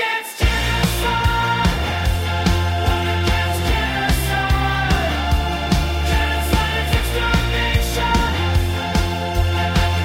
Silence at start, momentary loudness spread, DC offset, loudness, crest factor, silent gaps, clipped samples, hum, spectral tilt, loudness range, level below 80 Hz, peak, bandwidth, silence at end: 0 s; 2 LU; under 0.1%; -19 LUFS; 14 dB; none; under 0.1%; none; -5 dB/octave; 0 LU; -22 dBFS; -4 dBFS; 16.5 kHz; 0 s